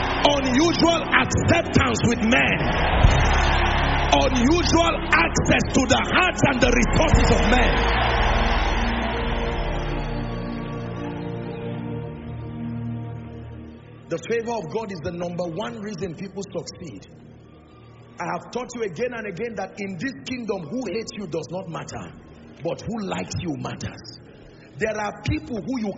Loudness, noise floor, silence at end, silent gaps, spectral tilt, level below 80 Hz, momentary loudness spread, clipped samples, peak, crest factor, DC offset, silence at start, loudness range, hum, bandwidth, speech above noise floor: -22 LUFS; -46 dBFS; 0 s; none; -4 dB/octave; -30 dBFS; 15 LU; under 0.1%; 0 dBFS; 22 dB; under 0.1%; 0 s; 13 LU; none; 8 kHz; 25 dB